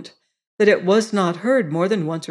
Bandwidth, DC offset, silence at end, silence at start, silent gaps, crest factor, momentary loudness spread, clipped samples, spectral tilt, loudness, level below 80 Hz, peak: 11.5 kHz; under 0.1%; 0.05 s; 0 s; 0.47-0.58 s; 16 dB; 5 LU; under 0.1%; -6 dB/octave; -19 LUFS; -68 dBFS; -4 dBFS